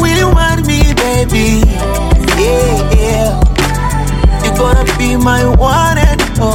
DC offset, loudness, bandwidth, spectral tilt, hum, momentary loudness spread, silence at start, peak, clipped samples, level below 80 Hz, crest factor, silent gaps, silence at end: under 0.1%; -11 LUFS; 17 kHz; -5 dB/octave; none; 3 LU; 0 s; 0 dBFS; under 0.1%; -12 dBFS; 10 dB; none; 0 s